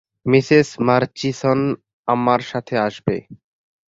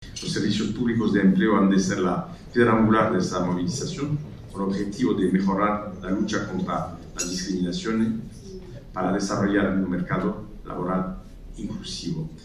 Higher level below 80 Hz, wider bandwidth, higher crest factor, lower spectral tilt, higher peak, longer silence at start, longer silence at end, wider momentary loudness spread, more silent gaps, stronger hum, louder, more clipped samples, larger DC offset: second, -56 dBFS vs -46 dBFS; second, 8 kHz vs 12 kHz; about the same, 18 dB vs 18 dB; about the same, -6.5 dB/octave vs -6 dB/octave; first, -2 dBFS vs -6 dBFS; first, 0.25 s vs 0 s; first, 0.6 s vs 0 s; second, 10 LU vs 15 LU; first, 1.93-2.04 s vs none; neither; first, -19 LUFS vs -24 LUFS; neither; neither